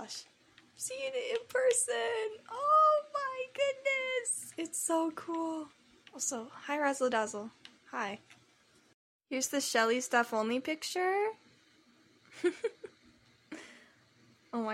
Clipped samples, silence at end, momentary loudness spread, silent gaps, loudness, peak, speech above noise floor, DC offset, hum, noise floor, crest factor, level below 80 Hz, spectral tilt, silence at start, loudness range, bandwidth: under 0.1%; 0 s; 18 LU; 8.94-9.19 s; -33 LUFS; -14 dBFS; 34 dB; under 0.1%; none; -66 dBFS; 20 dB; -84 dBFS; -1.5 dB/octave; 0 s; 7 LU; 16 kHz